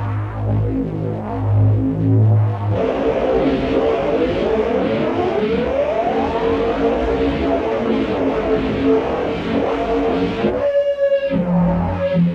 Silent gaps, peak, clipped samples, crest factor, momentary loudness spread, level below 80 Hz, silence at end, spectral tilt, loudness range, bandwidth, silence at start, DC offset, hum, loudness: none; -4 dBFS; under 0.1%; 12 dB; 4 LU; -34 dBFS; 0 s; -9 dB/octave; 1 LU; 6.8 kHz; 0 s; under 0.1%; none; -18 LUFS